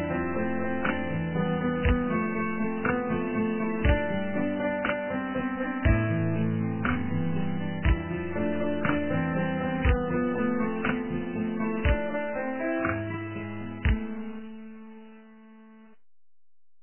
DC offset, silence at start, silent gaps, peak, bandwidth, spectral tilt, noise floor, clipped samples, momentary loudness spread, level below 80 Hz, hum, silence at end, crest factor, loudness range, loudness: under 0.1%; 0 s; none; -10 dBFS; 3.2 kHz; -11 dB/octave; -52 dBFS; under 0.1%; 6 LU; -36 dBFS; none; 0.95 s; 18 dB; 5 LU; -29 LUFS